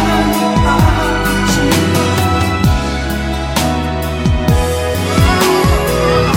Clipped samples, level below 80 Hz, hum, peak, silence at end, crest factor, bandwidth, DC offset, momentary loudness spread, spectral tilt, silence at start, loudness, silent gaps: under 0.1%; -20 dBFS; none; 0 dBFS; 0 s; 12 dB; 16.5 kHz; under 0.1%; 6 LU; -5 dB/octave; 0 s; -13 LUFS; none